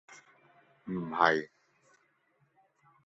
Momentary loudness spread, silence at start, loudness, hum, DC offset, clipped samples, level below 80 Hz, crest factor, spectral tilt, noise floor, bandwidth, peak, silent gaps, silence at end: 23 LU; 0.1 s; -30 LUFS; none; under 0.1%; under 0.1%; -74 dBFS; 30 dB; -3 dB/octave; -73 dBFS; 8 kHz; -6 dBFS; none; 1.6 s